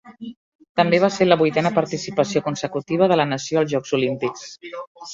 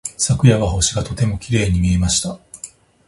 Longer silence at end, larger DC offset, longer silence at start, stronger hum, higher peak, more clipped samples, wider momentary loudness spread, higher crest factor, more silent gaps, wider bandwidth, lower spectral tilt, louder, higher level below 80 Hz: second, 0 s vs 0.4 s; neither; about the same, 0.05 s vs 0.05 s; neither; about the same, -2 dBFS vs 0 dBFS; neither; about the same, 18 LU vs 19 LU; about the same, 18 dB vs 16 dB; first, 0.37-0.59 s, 0.69-0.75 s, 4.87-4.95 s vs none; second, 7.8 kHz vs 11.5 kHz; about the same, -5.5 dB/octave vs -4.5 dB/octave; second, -20 LUFS vs -17 LUFS; second, -62 dBFS vs -30 dBFS